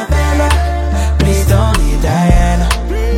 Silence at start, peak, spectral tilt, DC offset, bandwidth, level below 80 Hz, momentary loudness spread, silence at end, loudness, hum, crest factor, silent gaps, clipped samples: 0 s; 0 dBFS; -5.5 dB/octave; under 0.1%; 16 kHz; -12 dBFS; 4 LU; 0 s; -13 LUFS; none; 10 dB; none; under 0.1%